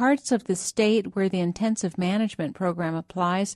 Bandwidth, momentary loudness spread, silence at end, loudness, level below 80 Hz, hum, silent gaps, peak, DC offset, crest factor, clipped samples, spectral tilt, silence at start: 12.5 kHz; 6 LU; 0 s; -25 LUFS; -62 dBFS; none; none; -10 dBFS; under 0.1%; 14 dB; under 0.1%; -5 dB/octave; 0 s